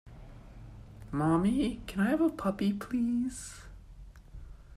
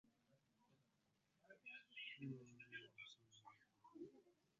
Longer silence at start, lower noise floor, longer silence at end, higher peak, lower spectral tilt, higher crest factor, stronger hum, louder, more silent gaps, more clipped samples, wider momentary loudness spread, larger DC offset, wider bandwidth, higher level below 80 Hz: about the same, 0.05 s vs 0.05 s; second, -50 dBFS vs -85 dBFS; second, 0 s vs 0.25 s; first, -16 dBFS vs -40 dBFS; first, -6.5 dB/octave vs -3.5 dB/octave; about the same, 16 dB vs 20 dB; neither; first, -31 LUFS vs -58 LUFS; neither; neither; first, 24 LU vs 14 LU; neither; first, 14.5 kHz vs 7.2 kHz; first, -50 dBFS vs under -90 dBFS